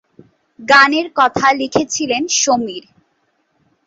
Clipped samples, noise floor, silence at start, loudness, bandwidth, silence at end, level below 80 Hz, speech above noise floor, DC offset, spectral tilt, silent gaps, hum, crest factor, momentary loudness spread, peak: under 0.1%; -64 dBFS; 0.6 s; -13 LUFS; 8.2 kHz; 1.1 s; -56 dBFS; 50 dB; under 0.1%; -1.5 dB/octave; none; none; 16 dB; 14 LU; 0 dBFS